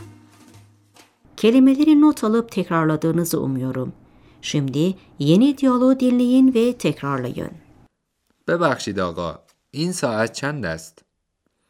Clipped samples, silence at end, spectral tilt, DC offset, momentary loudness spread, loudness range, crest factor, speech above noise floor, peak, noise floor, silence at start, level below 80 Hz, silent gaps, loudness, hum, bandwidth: under 0.1%; 0.8 s; -6 dB/octave; under 0.1%; 15 LU; 6 LU; 16 dB; 54 dB; -4 dBFS; -72 dBFS; 0 s; -58 dBFS; none; -19 LUFS; none; 15.5 kHz